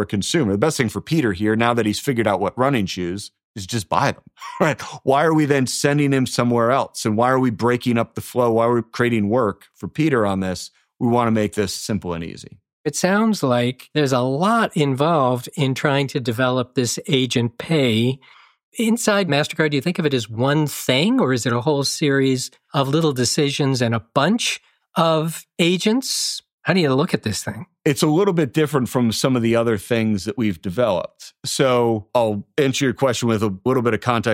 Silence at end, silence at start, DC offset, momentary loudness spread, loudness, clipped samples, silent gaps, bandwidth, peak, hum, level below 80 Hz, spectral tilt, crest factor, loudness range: 0 s; 0 s; under 0.1%; 7 LU; -20 LUFS; under 0.1%; 3.44-3.54 s, 12.73-12.84 s, 18.63-18.72 s, 26.53-26.58 s; 16.5 kHz; -2 dBFS; none; -56 dBFS; -5 dB/octave; 18 dB; 2 LU